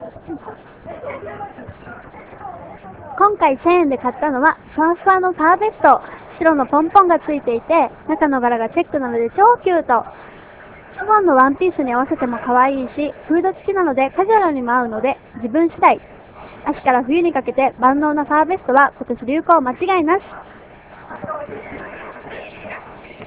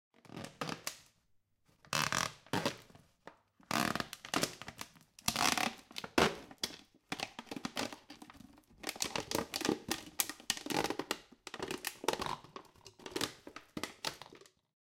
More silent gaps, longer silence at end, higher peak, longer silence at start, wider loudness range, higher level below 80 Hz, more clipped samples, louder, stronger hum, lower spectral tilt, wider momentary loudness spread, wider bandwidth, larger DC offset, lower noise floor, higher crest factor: neither; second, 0 s vs 0.55 s; first, 0 dBFS vs -12 dBFS; second, 0 s vs 0.25 s; about the same, 5 LU vs 5 LU; first, -50 dBFS vs -66 dBFS; neither; first, -16 LUFS vs -38 LUFS; neither; first, -9.5 dB/octave vs -2.5 dB/octave; about the same, 20 LU vs 20 LU; second, 4 kHz vs 17 kHz; neither; second, -41 dBFS vs -74 dBFS; second, 18 dB vs 28 dB